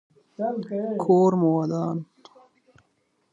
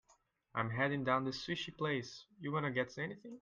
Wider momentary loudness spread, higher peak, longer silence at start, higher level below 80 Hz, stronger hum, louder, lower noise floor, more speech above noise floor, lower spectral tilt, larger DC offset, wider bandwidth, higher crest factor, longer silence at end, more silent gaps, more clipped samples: about the same, 11 LU vs 9 LU; first, -6 dBFS vs -18 dBFS; second, 0.4 s vs 0.55 s; about the same, -72 dBFS vs -70 dBFS; neither; first, -24 LUFS vs -38 LUFS; about the same, -70 dBFS vs -73 dBFS; first, 48 dB vs 35 dB; first, -9.5 dB/octave vs -6 dB/octave; neither; second, 7.6 kHz vs 9 kHz; about the same, 18 dB vs 20 dB; first, 1.3 s vs 0 s; neither; neither